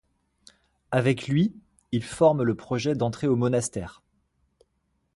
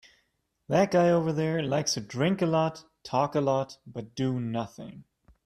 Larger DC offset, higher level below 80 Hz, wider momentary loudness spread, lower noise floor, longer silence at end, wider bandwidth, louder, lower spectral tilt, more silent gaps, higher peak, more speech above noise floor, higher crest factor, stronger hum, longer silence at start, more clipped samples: neither; first, -56 dBFS vs -64 dBFS; second, 10 LU vs 16 LU; about the same, -73 dBFS vs -74 dBFS; first, 1.25 s vs 0.45 s; second, 11.5 kHz vs 14 kHz; about the same, -25 LUFS vs -27 LUFS; about the same, -6.5 dB/octave vs -5.5 dB/octave; neither; first, -8 dBFS vs -12 dBFS; about the same, 49 dB vs 47 dB; about the same, 20 dB vs 16 dB; neither; first, 0.9 s vs 0.7 s; neither